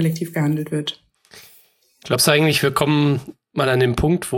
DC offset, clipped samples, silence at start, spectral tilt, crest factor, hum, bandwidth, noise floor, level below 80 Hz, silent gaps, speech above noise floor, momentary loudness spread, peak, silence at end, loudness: under 0.1%; under 0.1%; 0 s; -5 dB/octave; 20 dB; none; 17 kHz; -55 dBFS; -40 dBFS; none; 36 dB; 11 LU; 0 dBFS; 0 s; -19 LUFS